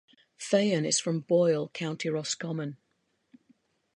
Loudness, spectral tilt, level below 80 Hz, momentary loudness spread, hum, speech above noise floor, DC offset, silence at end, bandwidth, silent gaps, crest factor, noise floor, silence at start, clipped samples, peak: -28 LUFS; -4.5 dB/octave; -78 dBFS; 10 LU; none; 47 dB; under 0.1%; 1.25 s; 11 kHz; none; 20 dB; -75 dBFS; 0.4 s; under 0.1%; -10 dBFS